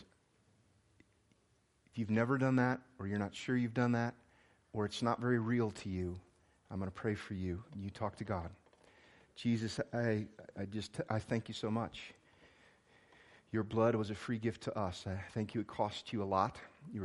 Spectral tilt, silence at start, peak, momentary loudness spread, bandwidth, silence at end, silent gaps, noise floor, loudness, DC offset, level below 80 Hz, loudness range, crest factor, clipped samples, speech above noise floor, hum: -7 dB/octave; 0 s; -18 dBFS; 11 LU; 11.5 kHz; 0 s; none; -74 dBFS; -38 LUFS; under 0.1%; -66 dBFS; 6 LU; 22 dB; under 0.1%; 37 dB; none